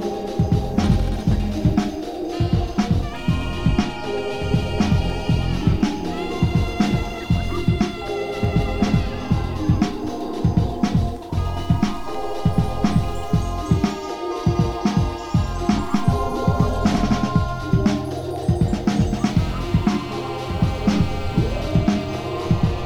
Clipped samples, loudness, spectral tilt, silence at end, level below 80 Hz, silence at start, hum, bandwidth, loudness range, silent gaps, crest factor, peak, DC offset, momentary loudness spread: under 0.1%; -22 LUFS; -7 dB/octave; 0 s; -30 dBFS; 0 s; none; 15.5 kHz; 2 LU; none; 16 dB; -4 dBFS; 0.9%; 5 LU